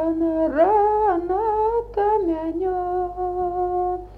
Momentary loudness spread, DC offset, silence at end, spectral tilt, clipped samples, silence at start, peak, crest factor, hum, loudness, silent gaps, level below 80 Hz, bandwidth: 7 LU; under 0.1%; 0 s; -9 dB/octave; under 0.1%; 0 s; -6 dBFS; 14 dB; none; -21 LUFS; none; -44 dBFS; 4.8 kHz